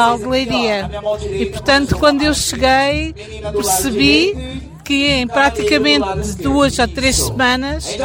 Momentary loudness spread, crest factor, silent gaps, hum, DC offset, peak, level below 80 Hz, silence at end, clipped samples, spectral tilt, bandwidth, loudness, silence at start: 9 LU; 14 dB; none; none; under 0.1%; 0 dBFS; -30 dBFS; 0 s; under 0.1%; -3.5 dB/octave; 17 kHz; -15 LUFS; 0 s